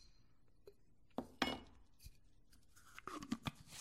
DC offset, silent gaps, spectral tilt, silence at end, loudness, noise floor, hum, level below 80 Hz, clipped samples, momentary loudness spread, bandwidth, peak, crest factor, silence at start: under 0.1%; none; -4 dB/octave; 0 s; -47 LUFS; -73 dBFS; none; -68 dBFS; under 0.1%; 25 LU; 16 kHz; -20 dBFS; 30 dB; 0 s